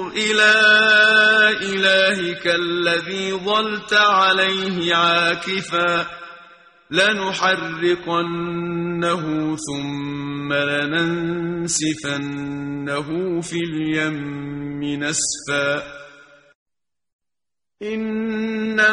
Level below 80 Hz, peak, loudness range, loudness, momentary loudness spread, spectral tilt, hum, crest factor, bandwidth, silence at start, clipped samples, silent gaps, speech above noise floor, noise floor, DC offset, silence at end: -58 dBFS; -2 dBFS; 9 LU; -18 LUFS; 14 LU; -3 dB/octave; none; 18 dB; 11 kHz; 0 s; under 0.1%; 16.55-16.66 s, 17.13-17.19 s; 70 dB; -90 dBFS; under 0.1%; 0 s